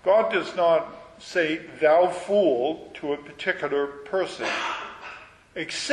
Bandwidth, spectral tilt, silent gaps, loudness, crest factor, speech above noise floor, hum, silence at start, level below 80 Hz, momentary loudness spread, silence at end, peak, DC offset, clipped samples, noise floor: 10.5 kHz; -4 dB/octave; none; -25 LUFS; 16 dB; 20 dB; none; 0.05 s; -64 dBFS; 18 LU; 0 s; -8 dBFS; under 0.1%; under 0.1%; -44 dBFS